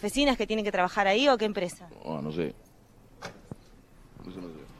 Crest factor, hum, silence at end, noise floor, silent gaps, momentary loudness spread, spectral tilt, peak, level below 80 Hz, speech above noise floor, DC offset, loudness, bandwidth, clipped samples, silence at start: 20 dB; none; 0 s; -56 dBFS; none; 23 LU; -4 dB/octave; -10 dBFS; -52 dBFS; 28 dB; under 0.1%; -27 LUFS; 14.5 kHz; under 0.1%; 0 s